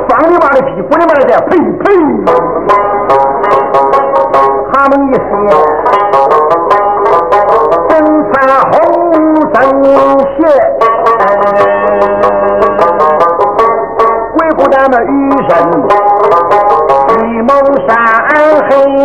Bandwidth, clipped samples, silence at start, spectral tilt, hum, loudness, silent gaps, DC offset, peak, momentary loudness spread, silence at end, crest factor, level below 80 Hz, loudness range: 9.2 kHz; 3%; 0 s; -7 dB/octave; none; -7 LUFS; none; 1%; 0 dBFS; 3 LU; 0 s; 8 dB; -38 dBFS; 1 LU